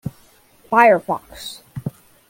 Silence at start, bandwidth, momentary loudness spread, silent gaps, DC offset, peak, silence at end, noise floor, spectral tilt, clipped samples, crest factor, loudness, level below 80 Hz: 0.05 s; 17 kHz; 20 LU; none; under 0.1%; -2 dBFS; 0.4 s; -52 dBFS; -5.5 dB/octave; under 0.1%; 18 dB; -16 LUFS; -54 dBFS